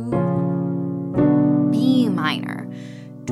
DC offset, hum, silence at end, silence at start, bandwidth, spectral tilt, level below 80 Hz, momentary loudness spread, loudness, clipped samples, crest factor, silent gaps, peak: under 0.1%; none; 0 s; 0 s; 12 kHz; -8 dB/octave; -52 dBFS; 17 LU; -20 LUFS; under 0.1%; 14 dB; none; -6 dBFS